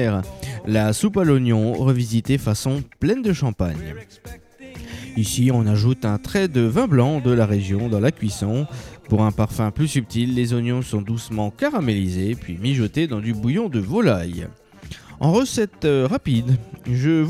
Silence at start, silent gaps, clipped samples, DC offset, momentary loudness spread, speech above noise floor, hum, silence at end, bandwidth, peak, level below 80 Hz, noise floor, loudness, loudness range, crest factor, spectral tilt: 0 s; none; under 0.1%; under 0.1%; 13 LU; 20 dB; none; 0 s; 14.5 kHz; -4 dBFS; -44 dBFS; -40 dBFS; -21 LUFS; 3 LU; 16 dB; -6.5 dB/octave